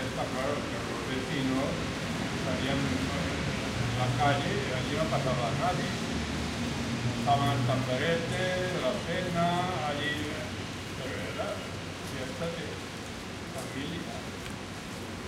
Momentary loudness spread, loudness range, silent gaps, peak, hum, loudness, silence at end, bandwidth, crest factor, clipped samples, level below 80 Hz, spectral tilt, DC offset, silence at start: 10 LU; 7 LU; none; -14 dBFS; none; -31 LUFS; 0 s; 16 kHz; 18 dB; under 0.1%; -48 dBFS; -5 dB/octave; under 0.1%; 0 s